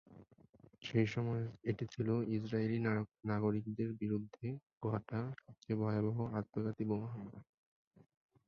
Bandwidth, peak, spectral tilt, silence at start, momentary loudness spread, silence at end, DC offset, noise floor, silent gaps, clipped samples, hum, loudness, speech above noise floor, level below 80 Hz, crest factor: 7 kHz; -20 dBFS; -7.5 dB/octave; 0.1 s; 10 LU; 1.05 s; under 0.1%; -65 dBFS; 0.49-0.53 s, 4.73-4.81 s; under 0.1%; none; -39 LUFS; 27 dB; -68 dBFS; 20 dB